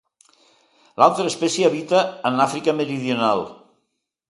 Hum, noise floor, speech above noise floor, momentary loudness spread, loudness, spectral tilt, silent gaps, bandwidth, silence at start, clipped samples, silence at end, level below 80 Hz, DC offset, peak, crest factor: none; -74 dBFS; 55 dB; 7 LU; -20 LUFS; -4.5 dB/octave; none; 11.5 kHz; 1 s; under 0.1%; 0.8 s; -68 dBFS; under 0.1%; 0 dBFS; 20 dB